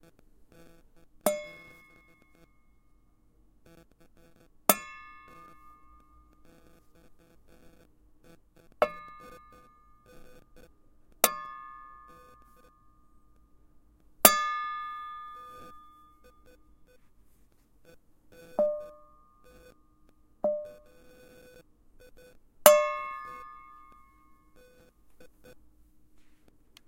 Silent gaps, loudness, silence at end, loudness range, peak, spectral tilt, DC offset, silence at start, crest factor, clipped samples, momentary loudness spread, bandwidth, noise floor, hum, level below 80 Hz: none; -27 LUFS; 1.6 s; 13 LU; 0 dBFS; -1 dB/octave; under 0.1%; 1.25 s; 36 dB; under 0.1%; 31 LU; 16.5 kHz; -63 dBFS; none; -64 dBFS